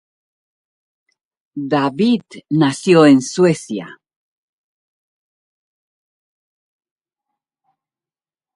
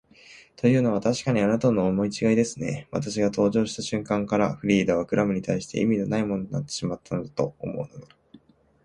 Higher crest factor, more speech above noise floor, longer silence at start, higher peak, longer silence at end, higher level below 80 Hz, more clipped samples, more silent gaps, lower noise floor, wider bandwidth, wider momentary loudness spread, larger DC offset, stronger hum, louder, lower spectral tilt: about the same, 20 dB vs 18 dB; first, over 76 dB vs 30 dB; first, 1.55 s vs 0.3 s; first, 0 dBFS vs -8 dBFS; first, 4.65 s vs 0.5 s; second, -66 dBFS vs -56 dBFS; neither; neither; first, under -90 dBFS vs -55 dBFS; about the same, 11.5 kHz vs 11 kHz; first, 17 LU vs 9 LU; neither; neither; first, -15 LUFS vs -25 LUFS; about the same, -6 dB/octave vs -6 dB/octave